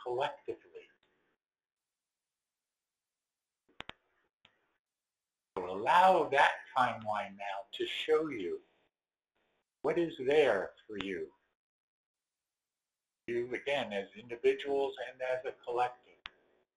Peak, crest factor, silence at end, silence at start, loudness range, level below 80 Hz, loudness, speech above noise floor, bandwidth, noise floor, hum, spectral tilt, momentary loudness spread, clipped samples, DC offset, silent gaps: -12 dBFS; 24 dB; 0.85 s; 0 s; 11 LU; -74 dBFS; -33 LUFS; over 57 dB; 11.5 kHz; under -90 dBFS; none; -4.5 dB/octave; 20 LU; under 0.1%; under 0.1%; 4.33-4.40 s, 4.79-4.84 s, 11.55-12.14 s